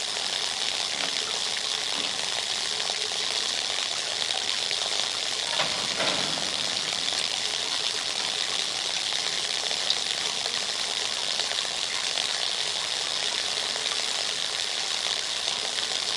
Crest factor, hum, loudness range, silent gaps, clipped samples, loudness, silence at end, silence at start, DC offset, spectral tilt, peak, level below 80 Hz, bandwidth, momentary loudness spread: 22 dB; none; 1 LU; none; under 0.1%; -25 LUFS; 0 s; 0 s; under 0.1%; 1 dB/octave; -6 dBFS; -68 dBFS; 11.5 kHz; 2 LU